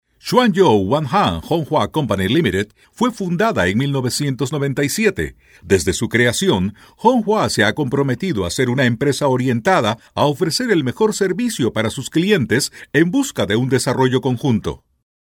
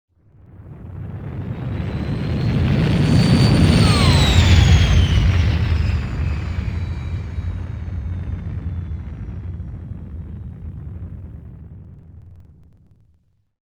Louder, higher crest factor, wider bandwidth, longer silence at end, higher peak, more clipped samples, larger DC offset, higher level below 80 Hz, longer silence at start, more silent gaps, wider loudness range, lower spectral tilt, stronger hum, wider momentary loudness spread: about the same, -17 LUFS vs -18 LUFS; about the same, 16 dB vs 18 dB; first, 18 kHz vs 10 kHz; second, 0.45 s vs 1.25 s; about the same, 0 dBFS vs 0 dBFS; neither; neither; second, -46 dBFS vs -26 dBFS; second, 0.25 s vs 0.55 s; neither; second, 2 LU vs 20 LU; about the same, -5 dB/octave vs -6 dB/octave; neither; second, 5 LU vs 20 LU